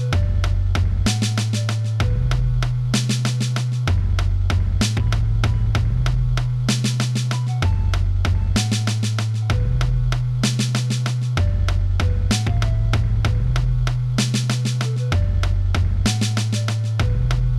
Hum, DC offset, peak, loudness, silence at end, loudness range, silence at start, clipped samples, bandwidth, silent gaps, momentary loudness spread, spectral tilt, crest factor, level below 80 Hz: none; 0.3%; -6 dBFS; -21 LUFS; 0 s; 0 LU; 0 s; under 0.1%; 13 kHz; none; 2 LU; -5 dB/octave; 12 dB; -24 dBFS